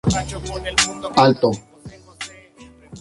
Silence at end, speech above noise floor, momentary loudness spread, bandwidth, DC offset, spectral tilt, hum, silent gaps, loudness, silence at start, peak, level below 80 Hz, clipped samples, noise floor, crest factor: 0 s; 27 dB; 18 LU; 11.5 kHz; under 0.1%; -4 dB/octave; none; none; -18 LUFS; 0.05 s; -2 dBFS; -40 dBFS; under 0.1%; -46 dBFS; 20 dB